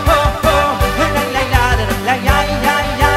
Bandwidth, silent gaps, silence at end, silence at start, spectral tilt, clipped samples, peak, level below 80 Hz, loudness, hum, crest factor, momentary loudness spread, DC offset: 16 kHz; none; 0 s; 0 s; -4.5 dB/octave; under 0.1%; 0 dBFS; -22 dBFS; -14 LUFS; none; 14 dB; 2 LU; under 0.1%